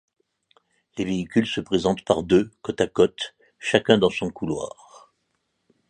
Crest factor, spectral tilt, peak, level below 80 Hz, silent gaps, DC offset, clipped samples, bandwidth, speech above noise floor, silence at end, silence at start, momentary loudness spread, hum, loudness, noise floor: 22 dB; -5.5 dB/octave; -2 dBFS; -52 dBFS; none; under 0.1%; under 0.1%; 10 kHz; 52 dB; 1.2 s; 0.95 s; 12 LU; none; -23 LUFS; -74 dBFS